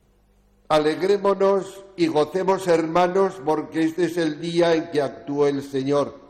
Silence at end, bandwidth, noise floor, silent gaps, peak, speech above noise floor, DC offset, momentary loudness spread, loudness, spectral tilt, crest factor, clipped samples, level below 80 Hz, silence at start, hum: 0.1 s; 14.5 kHz; -59 dBFS; none; -10 dBFS; 38 dB; under 0.1%; 6 LU; -22 LUFS; -6 dB/octave; 12 dB; under 0.1%; -60 dBFS; 0.7 s; none